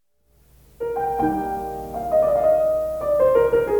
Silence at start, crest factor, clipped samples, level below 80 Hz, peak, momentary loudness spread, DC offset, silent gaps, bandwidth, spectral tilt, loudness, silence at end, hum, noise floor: 0.8 s; 14 dB; under 0.1%; -44 dBFS; -6 dBFS; 12 LU; under 0.1%; none; 19.5 kHz; -7 dB/octave; -21 LUFS; 0 s; none; -60 dBFS